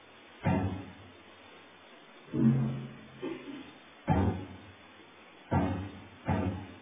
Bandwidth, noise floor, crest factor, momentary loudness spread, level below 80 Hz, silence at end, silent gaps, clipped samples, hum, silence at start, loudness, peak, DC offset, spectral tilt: 3.8 kHz; -55 dBFS; 20 dB; 24 LU; -48 dBFS; 0 s; none; under 0.1%; none; 0.1 s; -33 LUFS; -14 dBFS; under 0.1%; -7.5 dB/octave